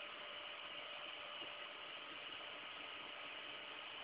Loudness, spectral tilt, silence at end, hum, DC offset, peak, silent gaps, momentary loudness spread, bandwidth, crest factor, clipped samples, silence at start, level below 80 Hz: -49 LUFS; 2 dB/octave; 0 s; none; under 0.1%; -38 dBFS; none; 1 LU; 4 kHz; 14 dB; under 0.1%; 0 s; -86 dBFS